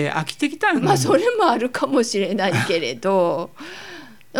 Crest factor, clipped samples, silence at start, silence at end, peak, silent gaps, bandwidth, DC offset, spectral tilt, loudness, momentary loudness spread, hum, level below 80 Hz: 16 dB; under 0.1%; 0 s; 0 s; -4 dBFS; none; 18.5 kHz; 0.4%; -4.5 dB/octave; -19 LUFS; 18 LU; none; -64 dBFS